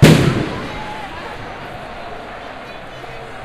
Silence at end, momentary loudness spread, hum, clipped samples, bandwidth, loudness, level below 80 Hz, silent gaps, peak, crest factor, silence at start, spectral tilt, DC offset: 0 s; 16 LU; none; 0.1%; 14 kHz; -22 LUFS; -36 dBFS; none; 0 dBFS; 18 dB; 0 s; -6 dB/octave; under 0.1%